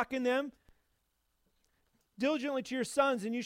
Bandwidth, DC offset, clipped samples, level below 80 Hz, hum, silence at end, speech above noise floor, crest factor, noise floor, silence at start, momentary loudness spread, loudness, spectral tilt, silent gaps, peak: 16 kHz; under 0.1%; under 0.1%; -72 dBFS; none; 0 s; 46 dB; 20 dB; -79 dBFS; 0 s; 5 LU; -33 LUFS; -4 dB/octave; none; -16 dBFS